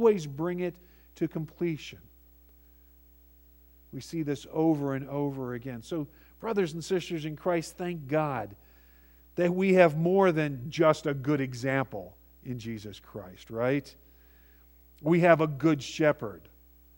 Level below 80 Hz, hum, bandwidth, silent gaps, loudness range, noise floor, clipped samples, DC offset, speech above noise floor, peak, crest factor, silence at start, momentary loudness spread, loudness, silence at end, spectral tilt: -60 dBFS; none; 16.5 kHz; none; 10 LU; -57 dBFS; under 0.1%; under 0.1%; 29 dB; -6 dBFS; 24 dB; 0 s; 18 LU; -29 LUFS; 0.6 s; -7 dB/octave